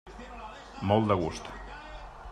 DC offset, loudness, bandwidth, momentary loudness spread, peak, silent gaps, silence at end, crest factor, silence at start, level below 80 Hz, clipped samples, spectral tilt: under 0.1%; -29 LUFS; 10.5 kHz; 20 LU; -10 dBFS; none; 0 s; 22 dB; 0.05 s; -48 dBFS; under 0.1%; -6.5 dB/octave